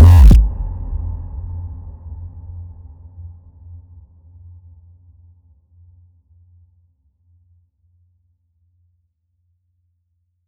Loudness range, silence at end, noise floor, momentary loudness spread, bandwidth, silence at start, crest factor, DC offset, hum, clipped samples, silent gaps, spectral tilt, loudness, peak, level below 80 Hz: 29 LU; 7.2 s; -68 dBFS; 31 LU; 7.6 kHz; 0 s; 18 dB; under 0.1%; none; under 0.1%; none; -8 dB/octave; -15 LUFS; 0 dBFS; -20 dBFS